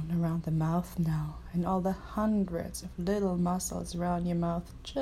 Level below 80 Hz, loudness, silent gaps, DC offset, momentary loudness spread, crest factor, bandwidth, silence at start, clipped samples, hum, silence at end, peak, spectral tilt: -46 dBFS; -32 LUFS; none; under 0.1%; 6 LU; 12 dB; 14.5 kHz; 0 s; under 0.1%; none; 0 s; -18 dBFS; -7 dB/octave